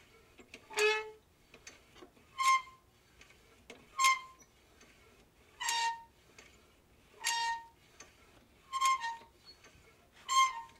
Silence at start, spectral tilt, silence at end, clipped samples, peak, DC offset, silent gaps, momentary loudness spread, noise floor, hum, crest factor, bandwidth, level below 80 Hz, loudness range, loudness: 0.4 s; 1 dB/octave; 0.1 s; under 0.1%; -16 dBFS; under 0.1%; none; 26 LU; -65 dBFS; none; 22 dB; 16 kHz; -72 dBFS; 3 LU; -33 LUFS